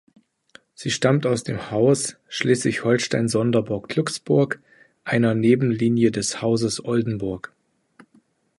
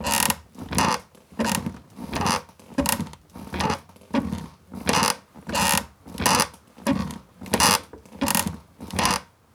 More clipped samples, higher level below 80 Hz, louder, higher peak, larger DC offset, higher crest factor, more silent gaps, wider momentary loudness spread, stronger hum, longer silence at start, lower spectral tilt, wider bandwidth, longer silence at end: neither; second, -56 dBFS vs -46 dBFS; about the same, -22 LUFS vs -24 LUFS; about the same, -4 dBFS vs -4 dBFS; neither; about the same, 18 dB vs 22 dB; neither; second, 9 LU vs 15 LU; neither; first, 0.8 s vs 0 s; first, -5.5 dB/octave vs -2.5 dB/octave; second, 11.5 kHz vs over 20 kHz; first, 1.2 s vs 0.3 s